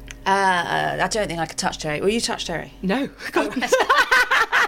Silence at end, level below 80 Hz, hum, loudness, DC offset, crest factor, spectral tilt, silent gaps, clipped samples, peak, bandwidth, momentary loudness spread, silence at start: 0 s; -46 dBFS; none; -20 LUFS; under 0.1%; 16 dB; -3 dB/octave; none; under 0.1%; -4 dBFS; 16.5 kHz; 9 LU; 0 s